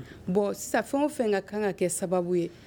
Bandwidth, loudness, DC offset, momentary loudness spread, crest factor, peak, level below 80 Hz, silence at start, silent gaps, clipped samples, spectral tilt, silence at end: 19.5 kHz; -28 LUFS; under 0.1%; 3 LU; 16 dB; -12 dBFS; -60 dBFS; 0 s; none; under 0.1%; -5 dB/octave; 0 s